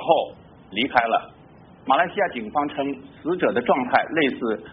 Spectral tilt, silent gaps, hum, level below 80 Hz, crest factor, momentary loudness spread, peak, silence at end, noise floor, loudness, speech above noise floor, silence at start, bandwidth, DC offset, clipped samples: -2.5 dB/octave; none; none; -60 dBFS; 20 dB; 10 LU; -2 dBFS; 0 s; -48 dBFS; -23 LUFS; 26 dB; 0 s; 4.2 kHz; under 0.1%; under 0.1%